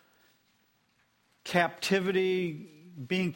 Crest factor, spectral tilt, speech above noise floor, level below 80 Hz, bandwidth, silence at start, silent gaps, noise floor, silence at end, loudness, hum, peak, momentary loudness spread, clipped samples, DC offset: 22 dB; -5 dB/octave; 42 dB; -72 dBFS; 16 kHz; 1.45 s; none; -71 dBFS; 0 s; -29 LUFS; 60 Hz at -70 dBFS; -10 dBFS; 19 LU; under 0.1%; under 0.1%